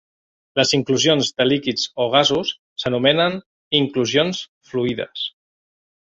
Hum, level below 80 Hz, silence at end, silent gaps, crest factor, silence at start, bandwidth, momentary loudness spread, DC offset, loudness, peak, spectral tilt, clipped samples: none; -58 dBFS; 0.75 s; 2.59-2.76 s, 3.46-3.71 s, 4.48-4.61 s; 20 dB; 0.55 s; 8 kHz; 11 LU; under 0.1%; -19 LUFS; -2 dBFS; -4 dB/octave; under 0.1%